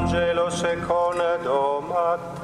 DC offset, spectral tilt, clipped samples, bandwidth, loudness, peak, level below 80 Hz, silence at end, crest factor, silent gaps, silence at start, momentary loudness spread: under 0.1%; -5 dB/octave; under 0.1%; 11.5 kHz; -23 LUFS; -10 dBFS; -44 dBFS; 0 s; 14 dB; none; 0 s; 2 LU